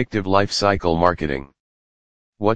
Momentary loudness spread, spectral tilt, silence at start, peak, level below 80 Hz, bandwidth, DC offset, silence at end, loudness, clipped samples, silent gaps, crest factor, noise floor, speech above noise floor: 8 LU; -5.5 dB/octave; 0 s; 0 dBFS; -42 dBFS; 10 kHz; under 0.1%; 0 s; -20 LUFS; under 0.1%; 1.60-2.33 s; 20 dB; under -90 dBFS; over 71 dB